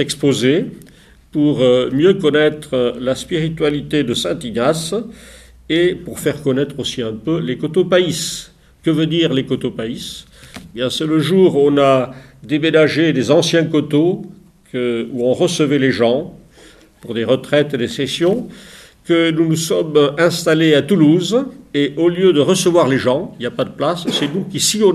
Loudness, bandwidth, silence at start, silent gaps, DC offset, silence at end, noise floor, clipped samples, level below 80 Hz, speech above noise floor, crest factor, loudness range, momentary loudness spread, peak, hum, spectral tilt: -16 LUFS; 15 kHz; 0 s; none; under 0.1%; 0 s; -45 dBFS; under 0.1%; -50 dBFS; 30 dB; 16 dB; 5 LU; 10 LU; 0 dBFS; none; -5 dB/octave